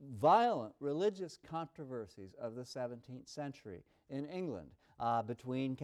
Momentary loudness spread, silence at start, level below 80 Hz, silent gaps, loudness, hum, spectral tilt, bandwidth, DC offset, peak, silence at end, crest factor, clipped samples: 19 LU; 0 s; -74 dBFS; none; -38 LUFS; none; -6.5 dB/octave; 13 kHz; under 0.1%; -18 dBFS; 0 s; 20 dB; under 0.1%